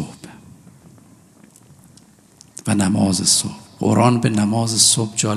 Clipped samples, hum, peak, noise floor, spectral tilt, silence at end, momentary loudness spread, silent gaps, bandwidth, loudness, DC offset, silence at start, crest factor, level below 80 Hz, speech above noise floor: under 0.1%; none; 0 dBFS; -49 dBFS; -4 dB/octave; 0 s; 16 LU; none; 13.5 kHz; -16 LUFS; under 0.1%; 0 s; 20 dB; -60 dBFS; 33 dB